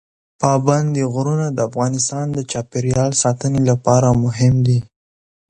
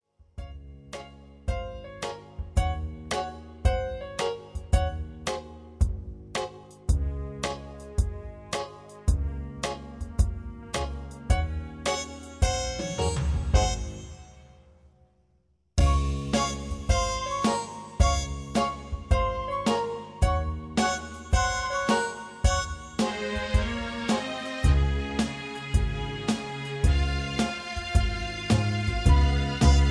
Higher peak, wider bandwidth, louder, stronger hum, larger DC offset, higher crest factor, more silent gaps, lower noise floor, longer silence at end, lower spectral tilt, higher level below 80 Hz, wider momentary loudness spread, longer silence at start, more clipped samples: first, 0 dBFS vs -6 dBFS; second, 9.8 kHz vs 11 kHz; first, -17 LUFS vs -28 LUFS; neither; neither; about the same, 16 dB vs 20 dB; neither; first, under -90 dBFS vs -67 dBFS; first, 0.65 s vs 0 s; about the same, -6 dB/octave vs -5 dB/octave; second, -44 dBFS vs -30 dBFS; second, 7 LU vs 13 LU; about the same, 0.4 s vs 0.4 s; neither